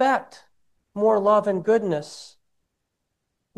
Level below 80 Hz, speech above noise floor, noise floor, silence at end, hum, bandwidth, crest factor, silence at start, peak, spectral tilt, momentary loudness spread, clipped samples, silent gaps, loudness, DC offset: -74 dBFS; 57 dB; -78 dBFS; 1.3 s; none; 11.5 kHz; 18 dB; 0 s; -6 dBFS; -6 dB/octave; 20 LU; under 0.1%; none; -22 LUFS; under 0.1%